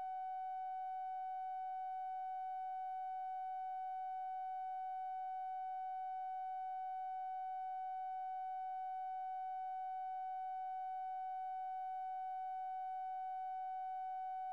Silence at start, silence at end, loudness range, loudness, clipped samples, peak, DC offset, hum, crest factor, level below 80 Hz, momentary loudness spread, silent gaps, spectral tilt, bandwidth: 0 s; 0 s; 0 LU; -45 LUFS; under 0.1%; -40 dBFS; under 0.1%; none; 4 dB; under -90 dBFS; 0 LU; none; -1 dB/octave; 4.8 kHz